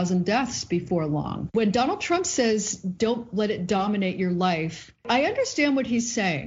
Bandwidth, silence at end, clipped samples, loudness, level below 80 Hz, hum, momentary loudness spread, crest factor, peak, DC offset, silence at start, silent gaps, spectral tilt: 8 kHz; 0 s; under 0.1%; -25 LUFS; -56 dBFS; none; 5 LU; 16 dB; -8 dBFS; under 0.1%; 0 s; none; -4.5 dB/octave